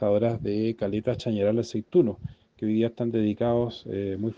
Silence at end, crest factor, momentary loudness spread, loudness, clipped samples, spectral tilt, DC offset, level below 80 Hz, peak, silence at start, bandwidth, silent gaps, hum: 0.05 s; 16 dB; 8 LU; -27 LUFS; under 0.1%; -8 dB/octave; under 0.1%; -56 dBFS; -10 dBFS; 0 s; 7.6 kHz; none; none